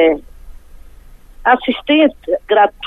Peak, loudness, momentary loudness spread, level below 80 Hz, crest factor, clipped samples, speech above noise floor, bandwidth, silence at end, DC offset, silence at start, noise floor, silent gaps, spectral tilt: 0 dBFS; -14 LUFS; 8 LU; -40 dBFS; 14 dB; under 0.1%; 25 dB; 4.1 kHz; 0 s; under 0.1%; 0 s; -39 dBFS; none; -5.5 dB/octave